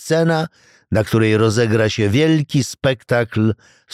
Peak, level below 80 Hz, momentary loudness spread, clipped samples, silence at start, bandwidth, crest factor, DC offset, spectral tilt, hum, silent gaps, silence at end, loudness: -4 dBFS; -48 dBFS; 6 LU; under 0.1%; 0 s; 15 kHz; 14 dB; 0.1%; -6 dB/octave; none; none; 0.4 s; -17 LUFS